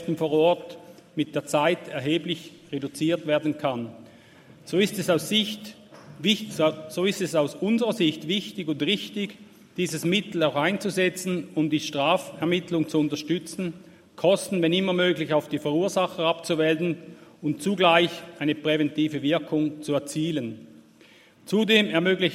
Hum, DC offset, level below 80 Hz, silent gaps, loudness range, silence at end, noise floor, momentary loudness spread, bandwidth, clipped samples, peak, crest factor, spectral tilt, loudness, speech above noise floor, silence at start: none; under 0.1%; -70 dBFS; none; 3 LU; 0 s; -54 dBFS; 11 LU; 16 kHz; under 0.1%; -4 dBFS; 22 dB; -5 dB/octave; -25 LUFS; 29 dB; 0 s